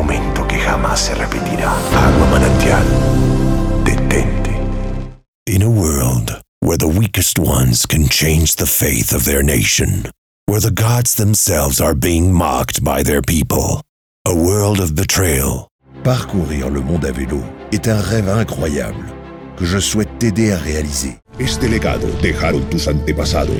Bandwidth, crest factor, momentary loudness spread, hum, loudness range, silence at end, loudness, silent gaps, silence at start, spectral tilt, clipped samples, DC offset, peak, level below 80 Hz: 19.5 kHz; 14 dB; 10 LU; none; 5 LU; 0 s; -15 LUFS; 5.28-5.46 s, 6.48-6.61 s, 10.18-10.47 s, 13.89-14.25 s, 15.71-15.79 s; 0 s; -4.5 dB/octave; under 0.1%; under 0.1%; 0 dBFS; -22 dBFS